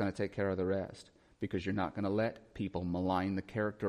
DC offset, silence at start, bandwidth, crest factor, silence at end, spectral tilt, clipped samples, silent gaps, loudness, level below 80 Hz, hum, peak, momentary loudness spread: under 0.1%; 0 s; 11.5 kHz; 16 dB; 0 s; -7.5 dB/octave; under 0.1%; none; -36 LUFS; -62 dBFS; none; -20 dBFS; 8 LU